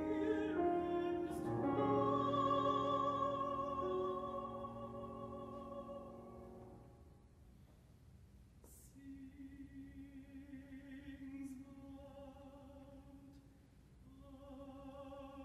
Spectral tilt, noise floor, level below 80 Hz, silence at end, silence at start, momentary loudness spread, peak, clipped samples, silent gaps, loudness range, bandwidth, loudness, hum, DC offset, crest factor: -7.5 dB/octave; -64 dBFS; -64 dBFS; 0 s; 0 s; 23 LU; -26 dBFS; under 0.1%; none; 21 LU; 13 kHz; -40 LUFS; none; under 0.1%; 18 dB